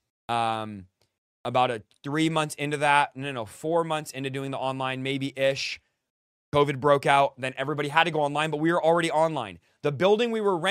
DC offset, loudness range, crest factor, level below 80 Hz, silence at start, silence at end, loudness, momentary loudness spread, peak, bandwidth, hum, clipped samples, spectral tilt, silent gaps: under 0.1%; 4 LU; 22 dB; -64 dBFS; 0.3 s; 0 s; -26 LUFS; 11 LU; -4 dBFS; 15 kHz; none; under 0.1%; -5 dB/octave; 1.18-1.44 s, 6.10-6.52 s